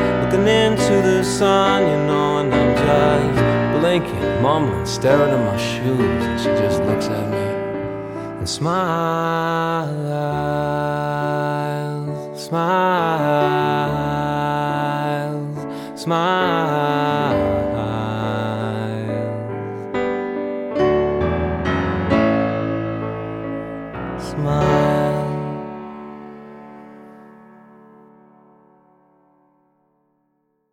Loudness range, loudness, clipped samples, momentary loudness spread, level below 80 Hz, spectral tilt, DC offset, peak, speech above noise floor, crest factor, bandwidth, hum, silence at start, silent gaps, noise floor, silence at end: 6 LU; -19 LUFS; under 0.1%; 12 LU; -40 dBFS; -6 dB/octave; under 0.1%; -2 dBFS; 50 dB; 18 dB; 17 kHz; none; 0 s; none; -68 dBFS; 3.4 s